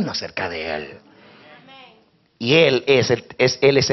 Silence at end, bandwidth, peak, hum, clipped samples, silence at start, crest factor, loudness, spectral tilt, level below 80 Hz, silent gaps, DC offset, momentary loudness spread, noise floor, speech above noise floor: 0 s; 6.4 kHz; -2 dBFS; none; under 0.1%; 0 s; 18 dB; -18 LUFS; -3.5 dB/octave; -56 dBFS; none; under 0.1%; 13 LU; -56 dBFS; 38 dB